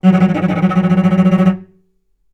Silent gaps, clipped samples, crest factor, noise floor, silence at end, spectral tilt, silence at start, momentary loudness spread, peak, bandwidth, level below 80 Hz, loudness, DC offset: none; under 0.1%; 12 dB; -59 dBFS; 0.7 s; -9 dB/octave; 0.05 s; 4 LU; 0 dBFS; 6.2 kHz; -54 dBFS; -13 LUFS; under 0.1%